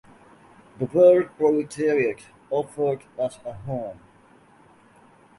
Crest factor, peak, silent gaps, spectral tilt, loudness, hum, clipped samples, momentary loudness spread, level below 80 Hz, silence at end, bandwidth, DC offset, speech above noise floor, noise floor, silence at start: 20 dB; -6 dBFS; none; -7 dB/octave; -23 LUFS; none; under 0.1%; 16 LU; -62 dBFS; 1.45 s; 11.5 kHz; under 0.1%; 32 dB; -54 dBFS; 0.8 s